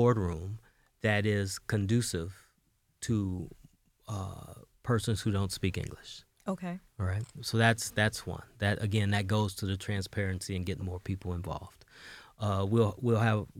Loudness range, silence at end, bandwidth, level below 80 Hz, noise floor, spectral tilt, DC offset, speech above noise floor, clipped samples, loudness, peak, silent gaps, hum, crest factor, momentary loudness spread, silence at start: 5 LU; 0 s; 15.5 kHz; -58 dBFS; -73 dBFS; -5.5 dB/octave; under 0.1%; 41 dB; under 0.1%; -32 LUFS; -10 dBFS; none; none; 22 dB; 15 LU; 0 s